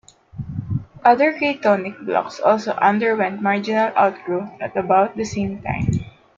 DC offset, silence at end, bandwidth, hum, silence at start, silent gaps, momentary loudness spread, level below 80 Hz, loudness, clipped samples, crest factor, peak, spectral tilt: under 0.1%; 0.3 s; 7.6 kHz; none; 0.35 s; none; 10 LU; -48 dBFS; -20 LUFS; under 0.1%; 20 dB; 0 dBFS; -6.5 dB/octave